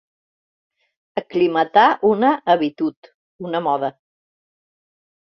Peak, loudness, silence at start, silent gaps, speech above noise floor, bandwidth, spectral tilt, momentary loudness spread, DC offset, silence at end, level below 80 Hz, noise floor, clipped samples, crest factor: -2 dBFS; -19 LUFS; 1.15 s; 2.96-3.02 s, 3.14-3.39 s; over 72 dB; 6.2 kHz; -7 dB/octave; 14 LU; under 0.1%; 1.4 s; -66 dBFS; under -90 dBFS; under 0.1%; 20 dB